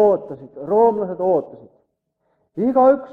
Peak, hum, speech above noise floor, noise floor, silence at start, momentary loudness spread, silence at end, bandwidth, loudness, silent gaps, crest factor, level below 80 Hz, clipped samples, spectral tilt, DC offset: -4 dBFS; none; 52 dB; -70 dBFS; 0 s; 20 LU; 0 s; 3.9 kHz; -18 LUFS; none; 16 dB; -64 dBFS; under 0.1%; -10 dB/octave; under 0.1%